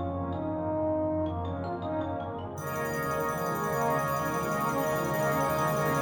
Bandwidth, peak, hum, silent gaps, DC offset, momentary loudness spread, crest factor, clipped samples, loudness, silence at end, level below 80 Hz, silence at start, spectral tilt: over 20 kHz; -16 dBFS; none; none; under 0.1%; 7 LU; 14 dB; under 0.1%; -30 LUFS; 0 s; -52 dBFS; 0 s; -6 dB/octave